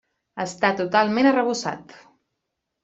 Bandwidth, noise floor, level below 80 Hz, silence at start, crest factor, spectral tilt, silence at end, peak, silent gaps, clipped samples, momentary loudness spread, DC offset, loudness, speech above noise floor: 8 kHz; -80 dBFS; -68 dBFS; 0.35 s; 18 dB; -4.5 dB/octave; 0.9 s; -4 dBFS; none; under 0.1%; 15 LU; under 0.1%; -21 LUFS; 58 dB